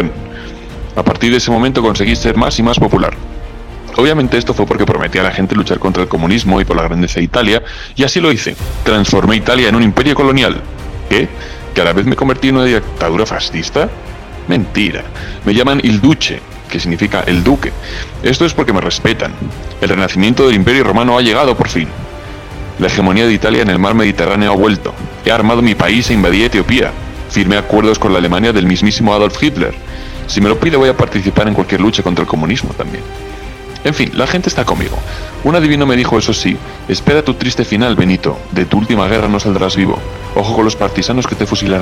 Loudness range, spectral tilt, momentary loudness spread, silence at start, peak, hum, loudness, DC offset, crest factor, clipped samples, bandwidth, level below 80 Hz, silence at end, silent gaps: 3 LU; -5.5 dB/octave; 13 LU; 0 s; 0 dBFS; none; -12 LUFS; under 0.1%; 12 dB; under 0.1%; 16 kHz; -26 dBFS; 0 s; none